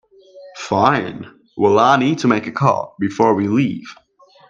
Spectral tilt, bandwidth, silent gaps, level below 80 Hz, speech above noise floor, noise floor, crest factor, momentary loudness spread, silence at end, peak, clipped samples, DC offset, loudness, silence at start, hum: -6.5 dB/octave; 7.6 kHz; none; -58 dBFS; 26 dB; -42 dBFS; 18 dB; 17 LU; 0.55 s; 0 dBFS; under 0.1%; under 0.1%; -16 LUFS; 0.35 s; none